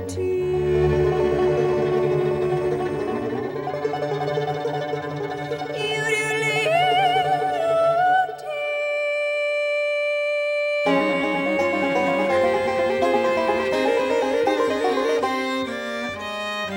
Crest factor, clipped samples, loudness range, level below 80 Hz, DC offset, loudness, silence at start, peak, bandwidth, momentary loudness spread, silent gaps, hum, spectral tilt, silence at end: 14 dB; under 0.1%; 4 LU; -46 dBFS; under 0.1%; -22 LUFS; 0 s; -8 dBFS; 16.5 kHz; 8 LU; none; none; -5.5 dB/octave; 0 s